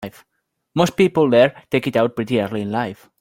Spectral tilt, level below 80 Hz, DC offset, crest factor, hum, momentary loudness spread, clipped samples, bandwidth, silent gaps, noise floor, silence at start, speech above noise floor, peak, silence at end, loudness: -6 dB/octave; -56 dBFS; under 0.1%; 18 dB; none; 12 LU; under 0.1%; 17 kHz; none; -74 dBFS; 0 s; 56 dB; -2 dBFS; 0.25 s; -19 LUFS